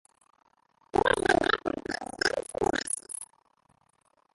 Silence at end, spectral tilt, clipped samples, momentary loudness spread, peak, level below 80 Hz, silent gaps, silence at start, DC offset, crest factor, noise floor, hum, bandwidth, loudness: 1.1 s; -3 dB/octave; under 0.1%; 13 LU; -8 dBFS; -54 dBFS; none; 0.95 s; under 0.1%; 24 dB; -69 dBFS; none; 12 kHz; -29 LUFS